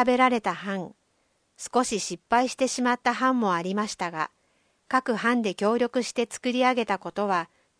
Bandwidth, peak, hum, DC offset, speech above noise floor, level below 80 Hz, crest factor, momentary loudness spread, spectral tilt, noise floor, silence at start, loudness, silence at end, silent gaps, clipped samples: 10.5 kHz; -6 dBFS; none; under 0.1%; 45 dB; -66 dBFS; 20 dB; 8 LU; -4 dB/octave; -70 dBFS; 0 s; -26 LUFS; 0.35 s; none; under 0.1%